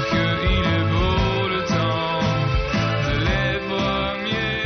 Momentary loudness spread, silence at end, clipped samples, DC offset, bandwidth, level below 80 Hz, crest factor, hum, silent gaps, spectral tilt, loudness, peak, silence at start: 3 LU; 0 s; under 0.1%; under 0.1%; 6.6 kHz; -30 dBFS; 10 dB; none; none; -4 dB/octave; -21 LUFS; -10 dBFS; 0 s